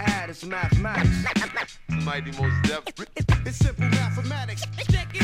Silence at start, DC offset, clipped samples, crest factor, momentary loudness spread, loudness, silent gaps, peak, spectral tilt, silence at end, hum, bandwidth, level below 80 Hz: 0 s; under 0.1%; under 0.1%; 16 dB; 8 LU; -25 LUFS; none; -8 dBFS; -5.5 dB/octave; 0 s; none; 14.5 kHz; -34 dBFS